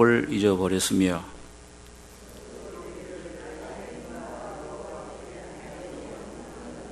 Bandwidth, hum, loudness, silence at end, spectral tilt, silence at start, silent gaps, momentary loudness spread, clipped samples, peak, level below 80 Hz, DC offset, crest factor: 13 kHz; none; -29 LUFS; 0 s; -5 dB/octave; 0 s; none; 23 LU; under 0.1%; -6 dBFS; -52 dBFS; under 0.1%; 24 dB